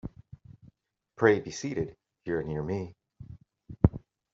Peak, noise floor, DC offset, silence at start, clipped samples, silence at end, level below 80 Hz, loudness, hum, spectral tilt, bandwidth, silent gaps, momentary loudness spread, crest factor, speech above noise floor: -6 dBFS; -64 dBFS; under 0.1%; 0.05 s; under 0.1%; 0.35 s; -48 dBFS; -29 LUFS; none; -7 dB/octave; 7.6 kHz; none; 25 LU; 26 dB; 36 dB